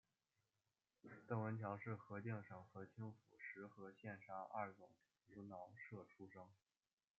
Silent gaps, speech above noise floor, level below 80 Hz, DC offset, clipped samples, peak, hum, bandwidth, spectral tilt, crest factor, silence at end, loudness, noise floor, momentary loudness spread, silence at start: none; over 37 dB; under -90 dBFS; under 0.1%; under 0.1%; -30 dBFS; none; 7.2 kHz; -8 dB/octave; 24 dB; 0.65 s; -53 LUFS; under -90 dBFS; 16 LU; 1.05 s